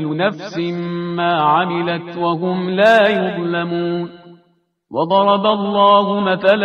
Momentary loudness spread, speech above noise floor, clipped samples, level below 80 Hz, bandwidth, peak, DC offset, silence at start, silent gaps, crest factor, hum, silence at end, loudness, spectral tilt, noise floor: 11 LU; 45 dB; under 0.1%; -62 dBFS; 8.8 kHz; 0 dBFS; under 0.1%; 0 s; none; 16 dB; none; 0 s; -16 LUFS; -7 dB/octave; -61 dBFS